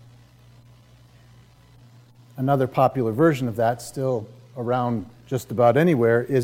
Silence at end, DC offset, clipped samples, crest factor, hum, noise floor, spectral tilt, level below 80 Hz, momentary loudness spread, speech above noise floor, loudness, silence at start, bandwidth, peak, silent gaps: 0 s; under 0.1%; under 0.1%; 18 dB; none; -51 dBFS; -7.5 dB/octave; -60 dBFS; 12 LU; 30 dB; -22 LUFS; 2.35 s; 16.5 kHz; -6 dBFS; none